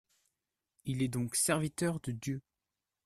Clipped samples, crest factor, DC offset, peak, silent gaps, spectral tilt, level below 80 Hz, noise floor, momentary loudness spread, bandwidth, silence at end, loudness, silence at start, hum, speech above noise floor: under 0.1%; 20 dB; under 0.1%; -16 dBFS; none; -4.5 dB/octave; -64 dBFS; -90 dBFS; 11 LU; 14.5 kHz; 0.65 s; -34 LUFS; 0.85 s; none; 56 dB